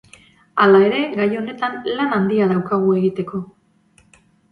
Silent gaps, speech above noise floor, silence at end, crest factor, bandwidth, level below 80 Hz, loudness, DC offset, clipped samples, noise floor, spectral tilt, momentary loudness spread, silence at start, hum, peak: none; 39 dB; 1.05 s; 16 dB; 5.2 kHz; -60 dBFS; -18 LUFS; under 0.1%; under 0.1%; -56 dBFS; -8 dB/octave; 13 LU; 0.55 s; none; -2 dBFS